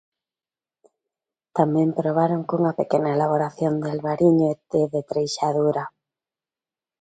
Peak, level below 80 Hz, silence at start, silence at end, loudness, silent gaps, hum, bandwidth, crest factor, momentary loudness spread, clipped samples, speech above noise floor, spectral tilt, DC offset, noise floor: -4 dBFS; -64 dBFS; 1.55 s; 1.15 s; -22 LUFS; none; none; 9.2 kHz; 20 dB; 6 LU; under 0.1%; over 69 dB; -7 dB/octave; under 0.1%; under -90 dBFS